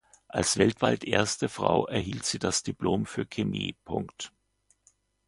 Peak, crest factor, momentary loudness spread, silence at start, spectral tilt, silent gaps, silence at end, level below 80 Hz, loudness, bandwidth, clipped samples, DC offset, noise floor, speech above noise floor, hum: -6 dBFS; 24 dB; 11 LU; 0.35 s; -4 dB/octave; none; 1 s; -54 dBFS; -28 LUFS; 11.5 kHz; under 0.1%; under 0.1%; -70 dBFS; 42 dB; none